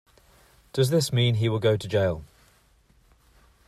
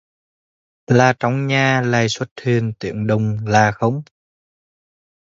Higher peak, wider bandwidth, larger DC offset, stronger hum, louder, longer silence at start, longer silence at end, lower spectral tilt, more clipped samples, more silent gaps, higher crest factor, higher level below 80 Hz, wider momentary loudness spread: second, -10 dBFS vs 0 dBFS; first, 14.5 kHz vs 7.8 kHz; neither; neither; second, -24 LUFS vs -18 LUFS; second, 0.75 s vs 0.9 s; first, 1.4 s vs 1.2 s; about the same, -6 dB/octave vs -6 dB/octave; neither; second, none vs 2.31-2.36 s; about the same, 16 dB vs 18 dB; about the same, -56 dBFS vs -52 dBFS; about the same, 7 LU vs 8 LU